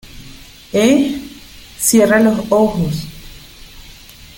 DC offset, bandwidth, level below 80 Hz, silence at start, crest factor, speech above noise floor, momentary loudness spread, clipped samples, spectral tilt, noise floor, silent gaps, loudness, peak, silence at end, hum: under 0.1%; 17 kHz; -40 dBFS; 0.1 s; 16 dB; 26 dB; 25 LU; under 0.1%; -4.5 dB/octave; -38 dBFS; none; -14 LUFS; 0 dBFS; 0.45 s; none